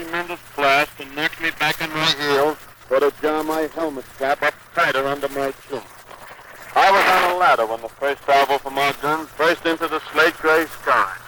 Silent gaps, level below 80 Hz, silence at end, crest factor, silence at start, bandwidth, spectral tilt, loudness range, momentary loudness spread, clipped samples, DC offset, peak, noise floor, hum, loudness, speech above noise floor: none; -54 dBFS; 0 s; 16 dB; 0 s; over 20 kHz; -3 dB/octave; 4 LU; 11 LU; under 0.1%; under 0.1%; -4 dBFS; -40 dBFS; none; -19 LUFS; 20 dB